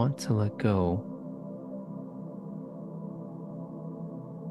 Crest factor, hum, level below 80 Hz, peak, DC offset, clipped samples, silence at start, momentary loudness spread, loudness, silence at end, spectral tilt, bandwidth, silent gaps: 20 dB; none; -60 dBFS; -12 dBFS; under 0.1%; under 0.1%; 0 s; 13 LU; -34 LUFS; 0 s; -7.5 dB/octave; 12.5 kHz; none